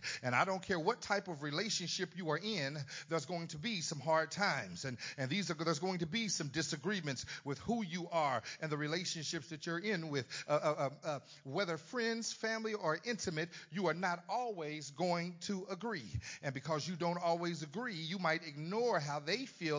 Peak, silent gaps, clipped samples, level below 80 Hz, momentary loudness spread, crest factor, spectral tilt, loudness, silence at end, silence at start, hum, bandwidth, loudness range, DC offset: -16 dBFS; none; under 0.1%; -68 dBFS; 7 LU; 22 dB; -4 dB/octave; -38 LUFS; 0 s; 0 s; none; 7.8 kHz; 2 LU; under 0.1%